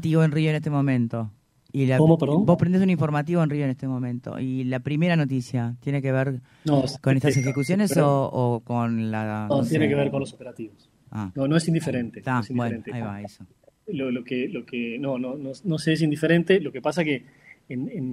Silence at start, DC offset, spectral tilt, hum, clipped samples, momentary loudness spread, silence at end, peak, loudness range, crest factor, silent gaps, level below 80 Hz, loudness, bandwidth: 0 s; under 0.1%; -7 dB/octave; none; under 0.1%; 13 LU; 0 s; -4 dBFS; 6 LU; 18 dB; none; -60 dBFS; -24 LUFS; 13.5 kHz